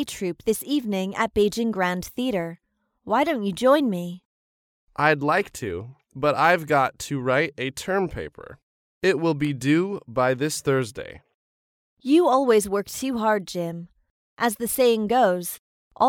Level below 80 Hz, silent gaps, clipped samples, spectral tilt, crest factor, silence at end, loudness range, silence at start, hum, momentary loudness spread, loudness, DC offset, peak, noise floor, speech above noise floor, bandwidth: -56 dBFS; 4.25-4.87 s, 8.63-9.01 s, 11.34-11.97 s, 14.10-14.37 s, 15.59-15.91 s; under 0.1%; -5 dB/octave; 18 dB; 0 s; 2 LU; 0 s; none; 14 LU; -23 LUFS; under 0.1%; -6 dBFS; under -90 dBFS; over 67 dB; 18 kHz